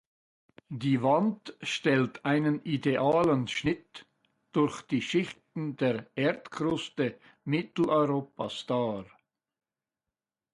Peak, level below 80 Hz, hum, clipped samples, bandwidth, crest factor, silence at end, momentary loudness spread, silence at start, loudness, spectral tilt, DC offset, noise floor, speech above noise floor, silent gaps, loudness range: -12 dBFS; -66 dBFS; none; under 0.1%; 11.5 kHz; 18 dB; 1.5 s; 11 LU; 0.7 s; -29 LUFS; -6.5 dB/octave; under 0.1%; under -90 dBFS; over 61 dB; none; 4 LU